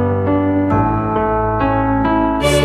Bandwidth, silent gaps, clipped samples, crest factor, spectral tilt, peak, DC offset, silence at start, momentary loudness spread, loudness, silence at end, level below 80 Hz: 14 kHz; none; under 0.1%; 12 dB; -6.5 dB/octave; -2 dBFS; under 0.1%; 0 s; 2 LU; -16 LUFS; 0 s; -30 dBFS